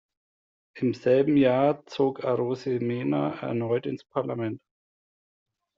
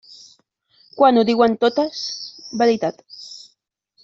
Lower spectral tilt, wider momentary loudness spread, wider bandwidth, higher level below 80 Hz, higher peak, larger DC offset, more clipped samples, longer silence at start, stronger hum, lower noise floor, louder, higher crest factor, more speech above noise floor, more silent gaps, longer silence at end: first, -6.5 dB/octave vs -4.5 dB/octave; second, 10 LU vs 21 LU; about the same, 7.4 kHz vs 7.6 kHz; about the same, -68 dBFS vs -64 dBFS; second, -10 dBFS vs -2 dBFS; neither; neither; second, 0.75 s vs 0.95 s; neither; first, under -90 dBFS vs -67 dBFS; second, -26 LUFS vs -18 LUFS; about the same, 18 dB vs 18 dB; first, over 65 dB vs 50 dB; neither; first, 1.2 s vs 0.65 s